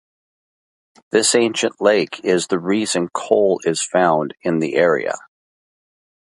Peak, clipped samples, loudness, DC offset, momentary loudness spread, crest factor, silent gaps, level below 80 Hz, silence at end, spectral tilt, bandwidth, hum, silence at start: 0 dBFS; under 0.1%; -18 LUFS; under 0.1%; 6 LU; 18 dB; none; -66 dBFS; 1.05 s; -3.5 dB/octave; 11.5 kHz; none; 1.15 s